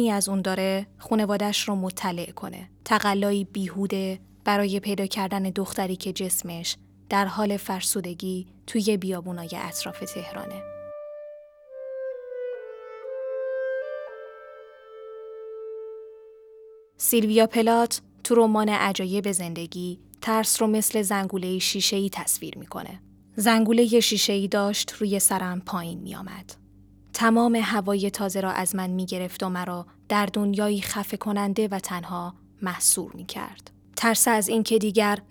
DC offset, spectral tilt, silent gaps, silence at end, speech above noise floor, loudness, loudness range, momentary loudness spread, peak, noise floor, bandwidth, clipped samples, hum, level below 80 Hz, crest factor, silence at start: under 0.1%; -3.5 dB/octave; none; 0.1 s; 28 dB; -25 LUFS; 12 LU; 18 LU; -4 dBFS; -52 dBFS; over 20 kHz; under 0.1%; none; -62 dBFS; 20 dB; 0 s